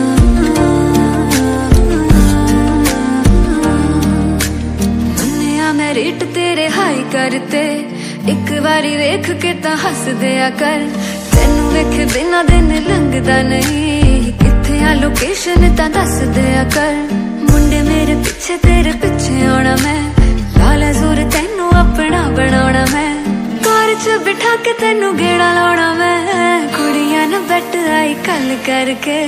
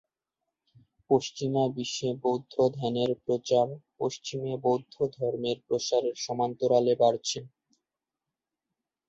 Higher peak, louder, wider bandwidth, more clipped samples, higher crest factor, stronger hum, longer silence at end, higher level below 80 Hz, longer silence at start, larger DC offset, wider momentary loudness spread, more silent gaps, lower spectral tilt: first, 0 dBFS vs -10 dBFS; first, -13 LUFS vs -29 LUFS; first, 16 kHz vs 8.2 kHz; first, 0.4% vs under 0.1%; second, 12 dB vs 20 dB; neither; second, 0 s vs 1.6 s; first, -18 dBFS vs -70 dBFS; second, 0 s vs 1.1 s; neither; second, 5 LU vs 8 LU; neither; about the same, -5 dB/octave vs -5 dB/octave